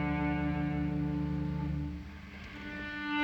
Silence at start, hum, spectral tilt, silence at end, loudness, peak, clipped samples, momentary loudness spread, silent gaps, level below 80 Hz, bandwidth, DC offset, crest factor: 0 s; none; -8 dB/octave; 0 s; -35 LUFS; -20 dBFS; under 0.1%; 13 LU; none; -44 dBFS; 7.2 kHz; under 0.1%; 14 dB